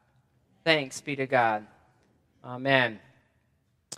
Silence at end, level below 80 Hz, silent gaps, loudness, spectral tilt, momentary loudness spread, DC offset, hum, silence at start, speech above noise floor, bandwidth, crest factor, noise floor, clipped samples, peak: 0 s; -76 dBFS; none; -26 LUFS; -4 dB/octave; 11 LU; under 0.1%; none; 0.65 s; 44 dB; 14 kHz; 26 dB; -71 dBFS; under 0.1%; -4 dBFS